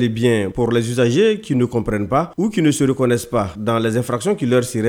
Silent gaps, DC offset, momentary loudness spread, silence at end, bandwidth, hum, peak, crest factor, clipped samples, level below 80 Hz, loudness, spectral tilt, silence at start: none; under 0.1%; 4 LU; 0 s; 16.5 kHz; none; -2 dBFS; 14 dB; under 0.1%; -44 dBFS; -18 LUFS; -6 dB/octave; 0 s